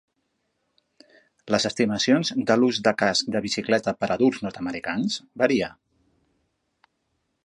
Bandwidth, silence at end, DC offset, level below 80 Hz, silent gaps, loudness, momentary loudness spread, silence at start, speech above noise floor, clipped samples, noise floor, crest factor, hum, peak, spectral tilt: 11 kHz; 1.75 s; under 0.1%; -62 dBFS; none; -23 LUFS; 8 LU; 1.45 s; 52 dB; under 0.1%; -75 dBFS; 22 dB; none; -4 dBFS; -4 dB/octave